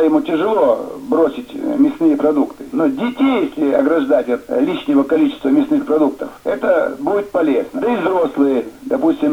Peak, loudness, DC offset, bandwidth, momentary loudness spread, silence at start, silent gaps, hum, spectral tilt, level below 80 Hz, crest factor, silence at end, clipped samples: -2 dBFS; -16 LUFS; under 0.1%; 14 kHz; 5 LU; 0 s; none; none; -7 dB/octave; -54 dBFS; 14 dB; 0 s; under 0.1%